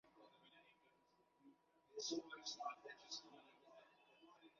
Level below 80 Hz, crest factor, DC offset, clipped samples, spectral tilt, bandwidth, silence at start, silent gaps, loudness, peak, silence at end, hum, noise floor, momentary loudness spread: under -90 dBFS; 22 dB; under 0.1%; under 0.1%; -0.5 dB/octave; 7.2 kHz; 0.05 s; none; -51 LUFS; -34 dBFS; 0 s; none; -79 dBFS; 22 LU